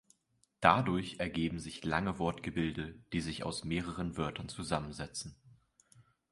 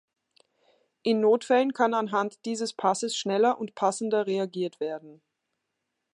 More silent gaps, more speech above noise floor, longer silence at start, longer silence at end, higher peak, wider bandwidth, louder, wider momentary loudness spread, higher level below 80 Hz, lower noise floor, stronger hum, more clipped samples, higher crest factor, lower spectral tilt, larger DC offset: neither; second, 41 dB vs 56 dB; second, 0.6 s vs 1.05 s; second, 0.3 s vs 1 s; about the same, -8 dBFS vs -8 dBFS; about the same, 11.5 kHz vs 11 kHz; second, -35 LUFS vs -27 LUFS; first, 13 LU vs 9 LU; first, -54 dBFS vs -84 dBFS; second, -76 dBFS vs -82 dBFS; neither; neither; first, 28 dB vs 20 dB; about the same, -5 dB/octave vs -4 dB/octave; neither